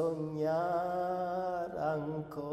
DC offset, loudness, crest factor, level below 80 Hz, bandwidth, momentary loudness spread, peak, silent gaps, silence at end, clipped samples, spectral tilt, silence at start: under 0.1%; -35 LUFS; 12 dB; -66 dBFS; 14 kHz; 4 LU; -22 dBFS; none; 0 s; under 0.1%; -8 dB/octave; 0 s